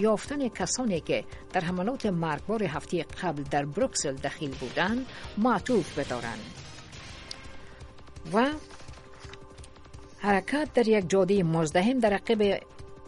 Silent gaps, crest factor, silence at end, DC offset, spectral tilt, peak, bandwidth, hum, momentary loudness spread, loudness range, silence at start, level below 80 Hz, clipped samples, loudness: none; 20 dB; 0 s; under 0.1%; -5 dB/octave; -10 dBFS; 11.5 kHz; none; 22 LU; 9 LU; 0 s; -52 dBFS; under 0.1%; -28 LUFS